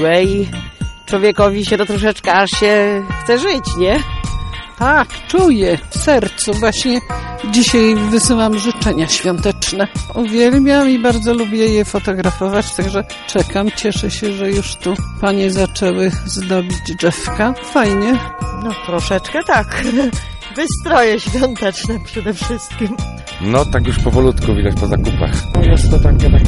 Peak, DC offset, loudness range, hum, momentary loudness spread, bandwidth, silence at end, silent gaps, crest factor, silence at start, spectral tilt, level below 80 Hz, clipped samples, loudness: 0 dBFS; under 0.1%; 4 LU; none; 10 LU; 11.5 kHz; 0 s; none; 14 dB; 0 s; -5 dB/octave; -22 dBFS; under 0.1%; -15 LUFS